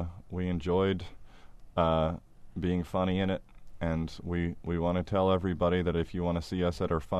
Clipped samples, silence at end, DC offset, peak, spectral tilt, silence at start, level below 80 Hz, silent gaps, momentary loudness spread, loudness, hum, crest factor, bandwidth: under 0.1%; 0 s; under 0.1%; -14 dBFS; -8 dB/octave; 0 s; -46 dBFS; none; 9 LU; -31 LUFS; none; 16 dB; 10.5 kHz